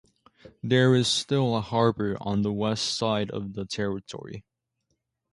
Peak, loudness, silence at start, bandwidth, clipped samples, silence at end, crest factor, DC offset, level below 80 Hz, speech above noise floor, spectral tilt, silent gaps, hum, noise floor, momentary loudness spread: -8 dBFS; -26 LUFS; 0.45 s; 11.5 kHz; under 0.1%; 0.9 s; 20 dB; under 0.1%; -58 dBFS; 52 dB; -5 dB/octave; none; none; -78 dBFS; 18 LU